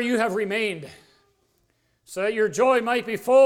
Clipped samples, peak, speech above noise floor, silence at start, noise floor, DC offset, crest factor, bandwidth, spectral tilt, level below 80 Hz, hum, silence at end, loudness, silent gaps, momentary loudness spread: under 0.1%; -8 dBFS; 47 dB; 0 s; -68 dBFS; under 0.1%; 16 dB; 16.5 kHz; -4 dB/octave; -68 dBFS; none; 0 s; -23 LUFS; none; 16 LU